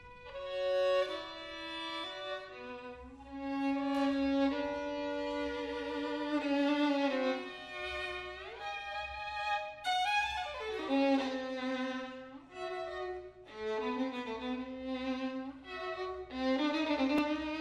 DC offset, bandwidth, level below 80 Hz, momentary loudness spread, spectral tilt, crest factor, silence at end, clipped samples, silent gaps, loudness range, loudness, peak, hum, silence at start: under 0.1%; 10 kHz; -62 dBFS; 13 LU; -4 dB/octave; 16 dB; 0 s; under 0.1%; none; 5 LU; -36 LUFS; -20 dBFS; none; 0 s